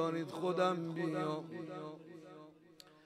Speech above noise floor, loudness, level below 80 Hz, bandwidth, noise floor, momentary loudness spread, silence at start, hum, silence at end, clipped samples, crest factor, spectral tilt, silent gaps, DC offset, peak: 24 dB; -38 LUFS; -86 dBFS; 14 kHz; -61 dBFS; 23 LU; 0 s; none; 0.1 s; under 0.1%; 18 dB; -6.5 dB/octave; none; under 0.1%; -20 dBFS